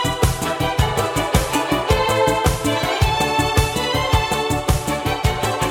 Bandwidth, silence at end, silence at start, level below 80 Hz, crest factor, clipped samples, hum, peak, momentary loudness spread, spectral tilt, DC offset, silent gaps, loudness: 17.5 kHz; 0 s; 0 s; -28 dBFS; 18 dB; under 0.1%; none; 0 dBFS; 3 LU; -4.5 dB/octave; under 0.1%; none; -19 LUFS